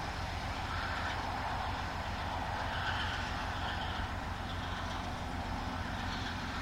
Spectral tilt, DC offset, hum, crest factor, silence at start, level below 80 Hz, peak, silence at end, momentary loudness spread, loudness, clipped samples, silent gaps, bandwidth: -4.5 dB/octave; under 0.1%; none; 16 dB; 0 s; -44 dBFS; -22 dBFS; 0 s; 4 LU; -37 LUFS; under 0.1%; none; 16 kHz